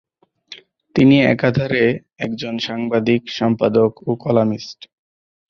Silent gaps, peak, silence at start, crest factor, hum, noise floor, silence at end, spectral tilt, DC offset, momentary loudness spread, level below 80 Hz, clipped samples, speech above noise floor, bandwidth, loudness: none; -2 dBFS; 0.5 s; 16 dB; none; -43 dBFS; 0.75 s; -7 dB/octave; under 0.1%; 12 LU; -52 dBFS; under 0.1%; 26 dB; 7 kHz; -17 LUFS